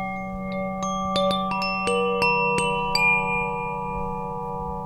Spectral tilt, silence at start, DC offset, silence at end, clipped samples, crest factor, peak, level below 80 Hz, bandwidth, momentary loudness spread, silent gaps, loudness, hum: -4.5 dB/octave; 0 s; under 0.1%; 0 s; under 0.1%; 16 dB; -8 dBFS; -44 dBFS; 14 kHz; 11 LU; none; -24 LUFS; none